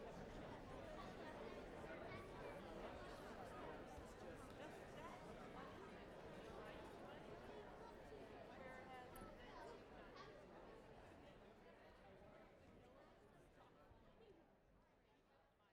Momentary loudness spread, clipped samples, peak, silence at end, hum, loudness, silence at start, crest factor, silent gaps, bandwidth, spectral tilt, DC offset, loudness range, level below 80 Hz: 12 LU; under 0.1%; -42 dBFS; 0 s; none; -58 LUFS; 0 s; 16 dB; none; 16 kHz; -5.5 dB/octave; under 0.1%; 11 LU; -70 dBFS